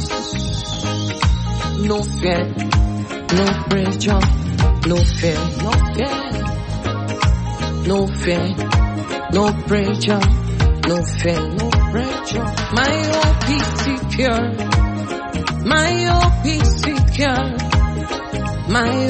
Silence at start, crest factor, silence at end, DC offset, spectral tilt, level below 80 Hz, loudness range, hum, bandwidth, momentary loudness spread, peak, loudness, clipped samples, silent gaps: 0 s; 14 dB; 0 s; under 0.1%; -5.5 dB/octave; -22 dBFS; 3 LU; none; 8.8 kHz; 6 LU; -4 dBFS; -18 LUFS; under 0.1%; none